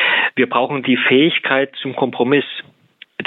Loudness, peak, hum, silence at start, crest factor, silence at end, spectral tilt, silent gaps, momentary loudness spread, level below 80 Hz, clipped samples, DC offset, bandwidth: -16 LUFS; 0 dBFS; none; 0 s; 16 dB; 0 s; -8 dB/octave; none; 12 LU; -70 dBFS; under 0.1%; under 0.1%; 4.2 kHz